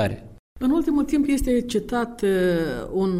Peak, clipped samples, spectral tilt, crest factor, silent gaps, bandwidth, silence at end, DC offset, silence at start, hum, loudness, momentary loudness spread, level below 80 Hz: -10 dBFS; under 0.1%; -6.5 dB/octave; 12 dB; 0.39-0.56 s; 15.5 kHz; 0 s; under 0.1%; 0 s; none; -23 LUFS; 6 LU; -38 dBFS